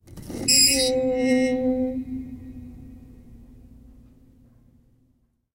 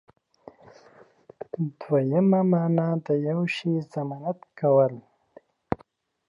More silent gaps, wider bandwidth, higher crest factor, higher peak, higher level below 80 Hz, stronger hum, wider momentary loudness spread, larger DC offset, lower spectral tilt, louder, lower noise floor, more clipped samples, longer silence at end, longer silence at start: neither; first, 16 kHz vs 7.4 kHz; about the same, 20 dB vs 20 dB; about the same, -6 dBFS vs -6 dBFS; first, -48 dBFS vs -62 dBFS; neither; first, 25 LU vs 13 LU; neither; second, -2 dB/octave vs -9 dB/octave; first, -20 LUFS vs -25 LUFS; first, -66 dBFS vs -60 dBFS; neither; first, 2.05 s vs 0.55 s; second, 0.1 s vs 1.6 s